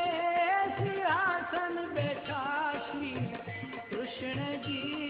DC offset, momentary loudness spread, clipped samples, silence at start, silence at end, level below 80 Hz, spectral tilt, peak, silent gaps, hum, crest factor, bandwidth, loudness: under 0.1%; 10 LU; under 0.1%; 0 s; 0 s; -68 dBFS; -8.5 dB/octave; -16 dBFS; none; none; 16 dB; 5.2 kHz; -33 LUFS